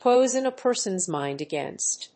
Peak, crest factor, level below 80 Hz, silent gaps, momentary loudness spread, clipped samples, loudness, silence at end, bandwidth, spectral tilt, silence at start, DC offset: -8 dBFS; 16 dB; -76 dBFS; none; 9 LU; under 0.1%; -25 LUFS; 0.1 s; 8.8 kHz; -3 dB/octave; 0 s; under 0.1%